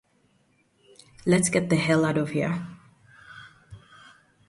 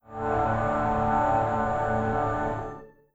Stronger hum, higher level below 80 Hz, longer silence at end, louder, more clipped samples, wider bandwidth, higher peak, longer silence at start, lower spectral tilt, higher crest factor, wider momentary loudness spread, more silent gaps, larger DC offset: neither; second, -60 dBFS vs -42 dBFS; first, 0.7 s vs 0.25 s; about the same, -24 LUFS vs -26 LUFS; neither; first, 11.5 kHz vs 8 kHz; first, -8 dBFS vs -12 dBFS; first, 1.25 s vs 0.1 s; second, -5 dB/octave vs -8 dB/octave; first, 20 dB vs 14 dB; first, 25 LU vs 8 LU; neither; neither